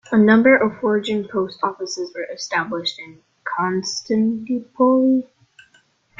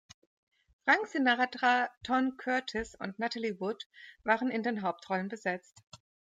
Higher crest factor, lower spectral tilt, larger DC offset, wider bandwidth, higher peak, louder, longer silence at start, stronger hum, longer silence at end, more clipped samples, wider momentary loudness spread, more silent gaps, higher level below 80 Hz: about the same, 18 dB vs 20 dB; about the same, -5 dB/octave vs -4.5 dB/octave; neither; second, 7.6 kHz vs 9.2 kHz; first, -2 dBFS vs -12 dBFS; first, -19 LUFS vs -32 LUFS; second, 0.1 s vs 0.85 s; neither; first, 0.95 s vs 0.4 s; neither; first, 14 LU vs 10 LU; second, none vs 1.97-2.01 s, 3.86-3.90 s, 5.87-5.92 s; about the same, -62 dBFS vs -66 dBFS